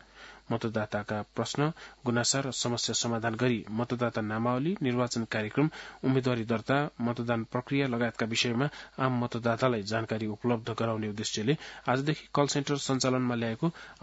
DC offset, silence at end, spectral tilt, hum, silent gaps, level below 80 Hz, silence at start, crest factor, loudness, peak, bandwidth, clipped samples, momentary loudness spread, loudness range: under 0.1%; 0.1 s; -5 dB/octave; none; none; -64 dBFS; 0.15 s; 20 dB; -30 LUFS; -10 dBFS; 8 kHz; under 0.1%; 5 LU; 1 LU